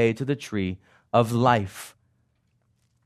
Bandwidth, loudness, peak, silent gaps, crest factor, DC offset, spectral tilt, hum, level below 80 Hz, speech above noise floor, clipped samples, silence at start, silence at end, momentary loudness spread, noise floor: 13.5 kHz; -24 LUFS; -4 dBFS; none; 22 dB; under 0.1%; -6.5 dB/octave; none; -66 dBFS; 45 dB; under 0.1%; 0 s; 1.15 s; 20 LU; -69 dBFS